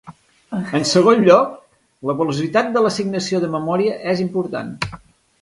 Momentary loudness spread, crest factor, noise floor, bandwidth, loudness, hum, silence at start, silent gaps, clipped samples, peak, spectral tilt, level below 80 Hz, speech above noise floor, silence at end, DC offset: 14 LU; 18 dB; -38 dBFS; 11.5 kHz; -18 LUFS; none; 0.05 s; none; under 0.1%; 0 dBFS; -5.5 dB/octave; -54 dBFS; 20 dB; 0.45 s; under 0.1%